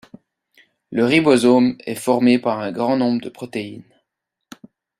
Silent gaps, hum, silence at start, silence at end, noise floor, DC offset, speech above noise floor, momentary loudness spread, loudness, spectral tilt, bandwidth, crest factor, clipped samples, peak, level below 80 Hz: none; none; 0.9 s; 1.2 s; -79 dBFS; under 0.1%; 62 dB; 15 LU; -18 LUFS; -5.5 dB/octave; 14 kHz; 18 dB; under 0.1%; -2 dBFS; -62 dBFS